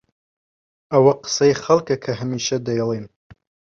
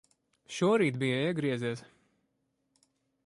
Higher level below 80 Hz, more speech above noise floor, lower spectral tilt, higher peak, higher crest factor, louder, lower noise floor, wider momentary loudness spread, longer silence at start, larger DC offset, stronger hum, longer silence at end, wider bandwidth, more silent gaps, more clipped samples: first, -58 dBFS vs -74 dBFS; first, over 71 dB vs 49 dB; about the same, -5 dB/octave vs -6 dB/octave; first, -2 dBFS vs -16 dBFS; about the same, 18 dB vs 18 dB; first, -19 LUFS vs -30 LUFS; first, under -90 dBFS vs -78 dBFS; second, 9 LU vs 13 LU; first, 0.9 s vs 0.5 s; neither; neither; second, 0.7 s vs 1.45 s; second, 7.6 kHz vs 11.5 kHz; neither; neither